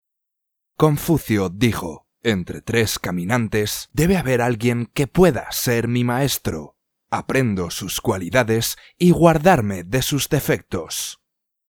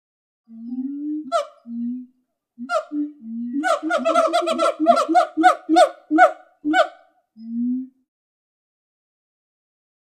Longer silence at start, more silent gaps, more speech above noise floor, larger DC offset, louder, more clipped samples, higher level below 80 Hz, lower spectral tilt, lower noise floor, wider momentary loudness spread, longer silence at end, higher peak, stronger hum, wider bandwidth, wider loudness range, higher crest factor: first, 0.8 s vs 0.5 s; neither; first, 58 dB vs 46 dB; neither; about the same, -20 LUFS vs -20 LUFS; neither; first, -42 dBFS vs -76 dBFS; first, -5 dB/octave vs -3 dB/octave; first, -78 dBFS vs -65 dBFS; second, 9 LU vs 15 LU; second, 0.55 s vs 2.2 s; about the same, 0 dBFS vs 0 dBFS; neither; first, over 20 kHz vs 13.5 kHz; second, 3 LU vs 11 LU; about the same, 20 dB vs 22 dB